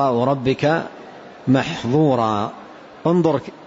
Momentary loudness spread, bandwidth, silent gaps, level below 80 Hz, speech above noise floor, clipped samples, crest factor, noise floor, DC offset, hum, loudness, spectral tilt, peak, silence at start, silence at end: 16 LU; 7.8 kHz; none; -54 dBFS; 21 dB; under 0.1%; 14 dB; -39 dBFS; under 0.1%; none; -19 LUFS; -7.5 dB/octave; -6 dBFS; 0 s; 0 s